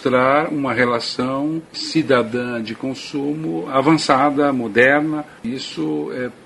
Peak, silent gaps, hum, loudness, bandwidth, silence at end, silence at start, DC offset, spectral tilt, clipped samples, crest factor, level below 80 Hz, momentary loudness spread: 0 dBFS; none; none; -19 LUFS; 11.5 kHz; 0.1 s; 0 s; under 0.1%; -5.5 dB/octave; under 0.1%; 18 dB; -56 dBFS; 12 LU